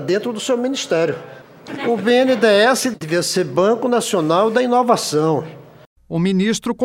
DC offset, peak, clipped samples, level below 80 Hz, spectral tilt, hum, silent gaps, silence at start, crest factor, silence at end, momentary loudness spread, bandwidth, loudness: under 0.1%; -2 dBFS; under 0.1%; -58 dBFS; -4.5 dB/octave; none; 5.86-5.96 s; 0 s; 16 dB; 0 s; 9 LU; 16 kHz; -17 LUFS